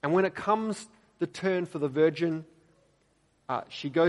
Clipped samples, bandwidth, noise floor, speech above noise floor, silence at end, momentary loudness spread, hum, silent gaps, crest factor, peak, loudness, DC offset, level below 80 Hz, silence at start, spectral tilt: under 0.1%; 11.5 kHz; -69 dBFS; 41 dB; 0 s; 12 LU; none; none; 18 dB; -12 dBFS; -30 LUFS; under 0.1%; -72 dBFS; 0.05 s; -6.5 dB/octave